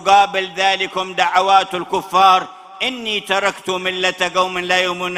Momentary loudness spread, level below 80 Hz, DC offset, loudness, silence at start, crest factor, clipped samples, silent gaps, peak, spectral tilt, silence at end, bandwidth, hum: 9 LU; -58 dBFS; under 0.1%; -16 LUFS; 0 s; 16 dB; under 0.1%; none; 0 dBFS; -2.5 dB/octave; 0 s; 15.5 kHz; none